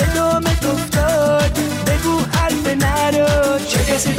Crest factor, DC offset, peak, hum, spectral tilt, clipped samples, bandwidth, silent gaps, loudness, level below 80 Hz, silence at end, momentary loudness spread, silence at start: 10 dB; under 0.1%; -6 dBFS; none; -4.5 dB/octave; under 0.1%; 16.5 kHz; none; -16 LUFS; -26 dBFS; 0 s; 3 LU; 0 s